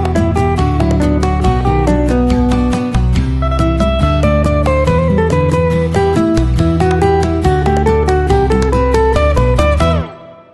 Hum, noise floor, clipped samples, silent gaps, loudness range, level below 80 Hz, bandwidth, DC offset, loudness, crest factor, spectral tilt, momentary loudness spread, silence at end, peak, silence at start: none; -31 dBFS; under 0.1%; none; 1 LU; -18 dBFS; 12 kHz; under 0.1%; -13 LUFS; 12 dB; -7.5 dB/octave; 2 LU; 0.2 s; 0 dBFS; 0 s